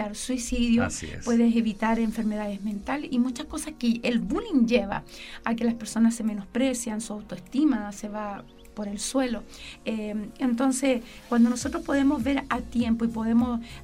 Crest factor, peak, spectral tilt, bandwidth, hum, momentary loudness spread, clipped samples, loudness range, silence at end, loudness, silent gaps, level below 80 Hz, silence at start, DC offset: 18 dB; -8 dBFS; -4.5 dB/octave; 15 kHz; none; 11 LU; under 0.1%; 4 LU; 0 s; -27 LUFS; none; -46 dBFS; 0 s; under 0.1%